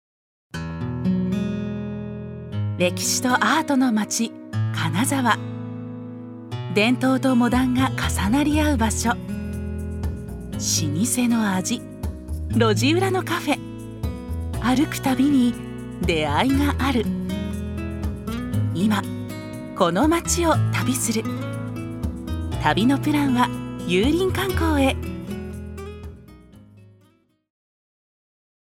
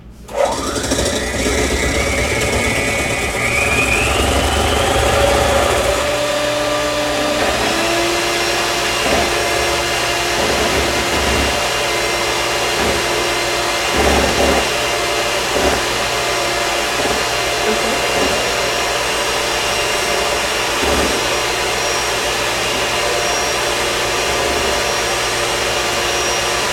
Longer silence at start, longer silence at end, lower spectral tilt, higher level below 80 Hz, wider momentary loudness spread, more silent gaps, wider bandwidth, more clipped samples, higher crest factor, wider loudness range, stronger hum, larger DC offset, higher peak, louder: first, 0.55 s vs 0 s; first, 1.9 s vs 0 s; first, -5 dB/octave vs -2.5 dB/octave; second, -36 dBFS vs -30 dBFS; first, 14 LU vs 3 LU; neither; about the same, 16.5 kHz vs 16.5 kHz; neither; about the same, 20 dB vs 16 dB; about the same, 3 LU vs 1 LU; neither; neither; about the same, -2 dBFS vs 0 dBFS; second, -22 LUFS vs -15 LUFS